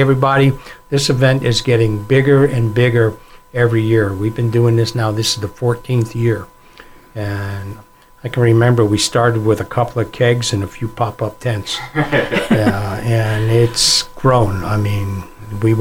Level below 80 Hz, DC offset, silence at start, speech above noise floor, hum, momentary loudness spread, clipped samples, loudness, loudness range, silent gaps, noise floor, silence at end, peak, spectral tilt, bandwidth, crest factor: -38 dBFS; 0.2%; 0 s; 26 dB; none; 11 LU; under 0.1%; -15 LUFS; 4 LU; none; -41 dBFS; 0 s; -2 dBFS; -5.5 dB/octave; 16 kHz; 14 dB